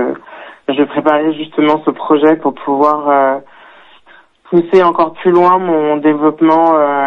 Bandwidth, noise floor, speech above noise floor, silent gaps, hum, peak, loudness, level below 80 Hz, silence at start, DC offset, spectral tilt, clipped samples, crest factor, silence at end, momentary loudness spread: 5.8 kHz; -45 dBFS; 34 dB; none; none; 0 dBFS; -12 LUFS; -60 dBFS; 0 s; under 0.1%; -8 dB/octave; under 0.1%; 12 dB; 0 s; 7 LU